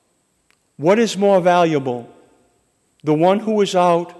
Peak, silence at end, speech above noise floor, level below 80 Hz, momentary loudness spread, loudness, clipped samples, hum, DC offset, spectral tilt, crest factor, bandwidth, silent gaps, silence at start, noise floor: -4 dBFS; 0.1 s; 49 dB; -68 dBFS; 10 LU; -16 LUFS; under 0.1%; none; under 0.1%; -6 dB/octave; 14 dB; 12 kHz; none; 0.8 s; -65 dBFS